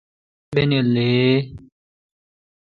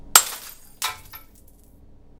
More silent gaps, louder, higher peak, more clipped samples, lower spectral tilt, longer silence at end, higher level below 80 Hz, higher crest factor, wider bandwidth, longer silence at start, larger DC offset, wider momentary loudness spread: neither; about the same, -19 LUFS vs -21 LUFS; second, -4 dBFS vs 0 dBFS; neither; first, -9 dB/octave vs 2 dB/octave; about the same, 1.1 s vs 1 s; about the same, -52 dBFS vs -52 dBFS; second, 16 dB vs 26 dB; second, 4.8 kHz vs 18 kHz; first, 0.5 s vs 0.05 s; neither; second, 7 LU vs 27 LU